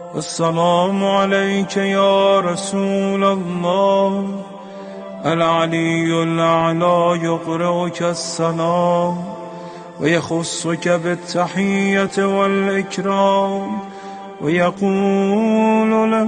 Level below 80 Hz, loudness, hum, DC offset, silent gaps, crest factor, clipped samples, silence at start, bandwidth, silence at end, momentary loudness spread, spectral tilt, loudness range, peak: -58 dBFS; -17 LUFS; none; under 0.1%; none; 14 dB; under 0.1%; 0 s; 10 kHz; 0 s; 11 LU; -5.5 dB/octave; 3 LU; -2 dBFS